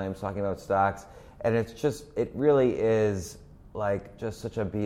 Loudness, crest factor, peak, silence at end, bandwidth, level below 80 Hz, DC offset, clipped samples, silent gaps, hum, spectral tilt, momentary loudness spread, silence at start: -28 LUFS; 16 dB; -12 dBFS; 0 s; 15.5 kHz; -52 dBFS; under 0.1%; under 0.1%; none; none; -7 dB/octave; 12 LU; 0 s